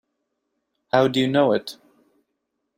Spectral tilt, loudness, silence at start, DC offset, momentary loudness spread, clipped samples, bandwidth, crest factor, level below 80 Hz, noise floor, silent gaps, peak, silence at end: -6 dB/octave; -20 LUFS; 0.95 s; under 0.1%; 7 LU; under 0.1%; 16 kHz; 20 dB; -66 dBFS; -77 dBFS; none; -4 dBFS; 1.05 s